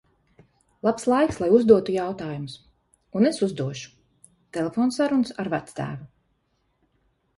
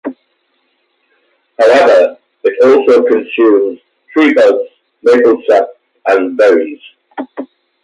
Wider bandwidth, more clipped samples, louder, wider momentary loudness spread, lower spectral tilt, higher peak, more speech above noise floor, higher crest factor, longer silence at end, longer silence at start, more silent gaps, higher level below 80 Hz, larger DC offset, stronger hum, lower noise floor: about the same, 11.5 kHz vs 10.5 kHz; neither; second, -23 LUFS vs -10 LUFS; about the same, 17 LU vs 18 LU; first, -6.5 dB/octave vs -4.5 dB/octave; about the same, -2 dBFS vs 0 dBFS; second, 48 dB vs 52 dB; first, 22 dB vs 12 dB; first, 1.3 s vs 0.4 s; first, 0.85 s vs 0.05 s; neither; about the same, -58 dBFS vs -62 dBFS; neither; neither; first, -71 dBFS vs -61 dBFS